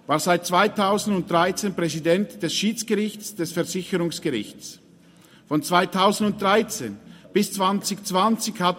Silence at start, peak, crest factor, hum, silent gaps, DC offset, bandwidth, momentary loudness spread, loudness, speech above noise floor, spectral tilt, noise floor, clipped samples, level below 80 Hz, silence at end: 0.1 s; -4 dBFS; 20 dB; none; none; under 0.1%; 16.5 kHz; 9 LU; -23 LUFS; 29 dB; -4 dB/octave; -52 dBFS; under 0.1%; -64 dBFS; 0 s